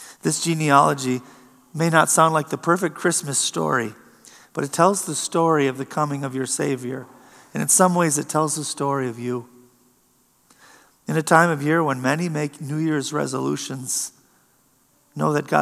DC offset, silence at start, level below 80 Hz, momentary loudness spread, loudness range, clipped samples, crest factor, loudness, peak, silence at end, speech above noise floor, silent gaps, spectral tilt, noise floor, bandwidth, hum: under 0.1%; 0 s; -76 dBFS; 13 LU; 5 LU; under 0.1%; 22 dB; -21 LUFS; 0 dBFS; 0 s; 40 dB; none; -4 dB/octave; -61 dBFS; 15 kHz; none